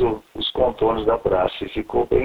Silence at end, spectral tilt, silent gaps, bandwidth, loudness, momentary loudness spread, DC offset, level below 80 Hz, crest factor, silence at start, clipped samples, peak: 0 s; -7.5 dB/octave; none; 11.5 kHz; -22 LUFS; 6 LU; 0.4%; -38 dBFS; 16 dB; 0 s; under 0.1%; -4 dBFS